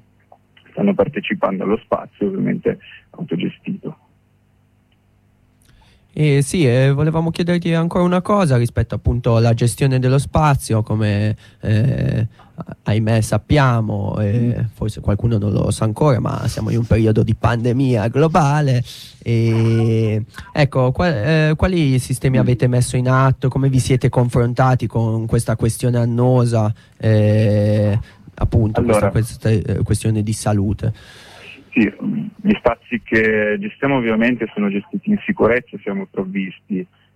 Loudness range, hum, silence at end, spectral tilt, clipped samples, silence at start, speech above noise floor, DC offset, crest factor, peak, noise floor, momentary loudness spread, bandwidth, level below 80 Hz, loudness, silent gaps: 5 LU; none; 0.3 s; -7 dB/octave; under 0.1%; 0.75 s; 40 dB; under 0.1%; 14 dB; -4 dBFS; -57 dBFS; 9 LU; 13 kHz; -36 dBFS; -17 LUFS; none